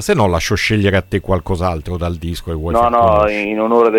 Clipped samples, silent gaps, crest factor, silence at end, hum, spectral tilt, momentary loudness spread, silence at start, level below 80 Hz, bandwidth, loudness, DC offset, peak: under 0.1%; none; 14 dB; 0 s; none; -6 dB/octave; 10 LU; 0 s; -30 dBFS; 17 kHz; -16 LUFS; under 0.1%; 0 dBFS